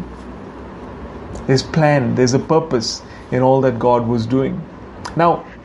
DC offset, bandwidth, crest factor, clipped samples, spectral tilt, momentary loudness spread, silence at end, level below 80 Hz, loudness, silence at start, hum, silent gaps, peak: under 0.1%; 11.5 kHz; 18 dB; under 0.1%; -6 dB/octave; 19 LU; 0 s; -40 dBFS; -17 LUFS; 0 s; none; none; 0 dBFS